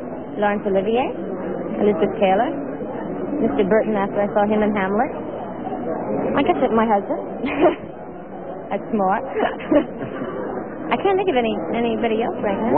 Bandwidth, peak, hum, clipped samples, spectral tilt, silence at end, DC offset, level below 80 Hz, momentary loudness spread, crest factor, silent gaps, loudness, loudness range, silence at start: 4.1 kHz; -4 dBFS; none; under 0.1%; -10.5 dB/octave; 0 s; 0.6%; -48 dBFS; 10 LU; 18 dB; none; -21 LUFS; 2 LU; 0 s